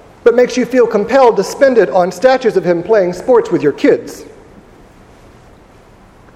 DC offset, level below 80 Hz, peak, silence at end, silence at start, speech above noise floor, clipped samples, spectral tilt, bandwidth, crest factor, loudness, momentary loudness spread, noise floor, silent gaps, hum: under 0.1%; -48 dBFS; 0 dBFS; 2.1 s; 0.25 s; 31 dB; 0.1%; -5.5 dB/octave; 14 kHz; 12 dB; -12 LUFS; 5 LU; -42 dBFS; none; none